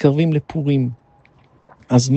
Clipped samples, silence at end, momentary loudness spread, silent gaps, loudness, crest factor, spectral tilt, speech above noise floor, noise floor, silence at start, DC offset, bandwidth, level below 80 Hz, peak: under 0.1%; 0 s; 8 LU; none; -19 LUFS; 18 dB; -7 dB/octave; 37 dB; -53 dBFS; 0 s; under 0.1%; 8.6 kHz; -54 dBFS; 0 dBFS